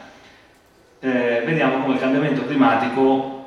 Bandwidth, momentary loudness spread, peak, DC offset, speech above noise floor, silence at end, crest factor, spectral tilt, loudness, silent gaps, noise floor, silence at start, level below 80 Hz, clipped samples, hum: 7 kHz; 4 LU; -2 dBFS; under 0.1%; 35 dB; 0 s; 18 dB; -7.5 dB/octave; -19 LUFS; none; -53 dBFS; 0 s; -62 dBFS; under 0.1%; none